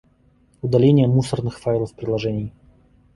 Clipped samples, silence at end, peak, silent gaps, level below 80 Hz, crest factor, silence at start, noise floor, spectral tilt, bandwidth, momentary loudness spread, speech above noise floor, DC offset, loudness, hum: under 0.1%; 0.65 s; -4 dBFS; none; -48 dBFS; 18 dB; 0.65 s; -57 dBFS; -8 dB/octave; 11.5 kHz; 14 LU; 39 dB; under 0.1%; -20 LUFS; none